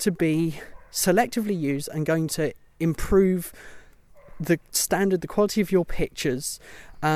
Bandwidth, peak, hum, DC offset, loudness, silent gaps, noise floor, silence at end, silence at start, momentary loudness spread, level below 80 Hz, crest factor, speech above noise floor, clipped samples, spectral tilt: 16.5 kHz; -8 dBFS; none; under 0.1%; -24 LUFS; none; -50 dBFS; 0 s; 0 s; 9 LU; -42 dBFS; 16 dB; 26 dB; under 0.1%; -5 dB/octave